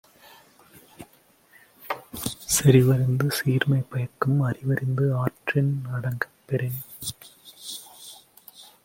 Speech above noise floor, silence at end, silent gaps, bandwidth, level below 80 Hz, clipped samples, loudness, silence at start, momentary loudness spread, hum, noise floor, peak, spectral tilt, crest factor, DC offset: 36 dB; 0.2 s; none; 17 kHz; -58 dBFS; under 0.1%; -24 LUFS; 1 s; 23 LU; none; -58 dBFS; -4 dBFS; -5.5 dB/octave; 20 dB; under 0.1%